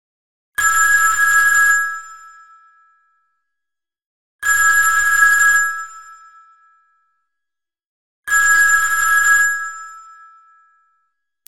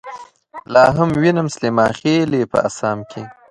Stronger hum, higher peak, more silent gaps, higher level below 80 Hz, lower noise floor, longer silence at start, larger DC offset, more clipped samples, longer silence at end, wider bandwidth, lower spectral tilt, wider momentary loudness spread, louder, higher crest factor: neither; about the same, 0 dBFS vs 0 dBFS; first, 4.06-4.39 s, 7.86-8.23 s vs none; about the same, -52 dBFS vs -48 dBFS; first, -83 dBFS vs -37 dBFS; first, 0.6 s vs 0.05 s; neither; neither; first, 1.2 s vs 0.2 s; first, 16.5 kHz vs 11.5 kHz; second, 2.5 dB/octave vs -6 dB/octave; second, 17 LU vs 20 LU; first, -13 LUFS vs -16 LUFS; about the same, 18 dB vs 16 dB